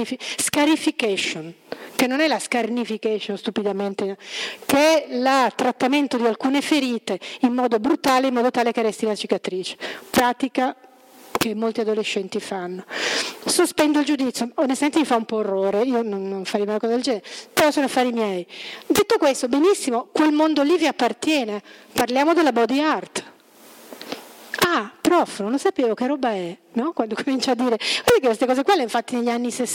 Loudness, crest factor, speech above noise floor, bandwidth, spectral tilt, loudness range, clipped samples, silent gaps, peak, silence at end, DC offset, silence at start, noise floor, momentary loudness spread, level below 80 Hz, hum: -21 LUFS; 18 dB; 27 dB; 17 kHz; -3.5 dB/octave; 4 LU; under 0.1%; none; -4 dBFS; 0 s; under 0.1%; 0 s; -48 dBFS; 10 LU; -60 dBFS; none